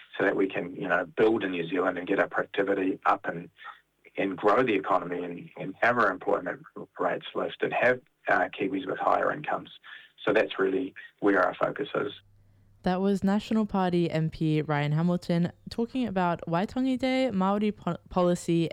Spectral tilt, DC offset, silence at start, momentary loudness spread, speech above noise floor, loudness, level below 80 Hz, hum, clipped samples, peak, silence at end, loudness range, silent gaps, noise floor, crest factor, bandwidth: -7 dB/octave; under 0.1%; 0 s; 10 LU; 32 dB; -28 LUFS; -60 dBFS; none; under 0.1%; -12 dBFS; 0 s; 1 LU; none; -59 dBFS; 16 dB; 11.5 kHz